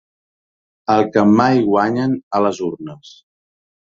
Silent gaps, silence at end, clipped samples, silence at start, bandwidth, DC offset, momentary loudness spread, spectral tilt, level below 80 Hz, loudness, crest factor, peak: 2.23-2.31 s; 0.8 s; under 0.1%; 0.9 s; 7.6 kHz; under 0.1%; 15 LU; -7 dB/octave; -58 dBFS; -16 LUFS; 16 dB; -2 dBFS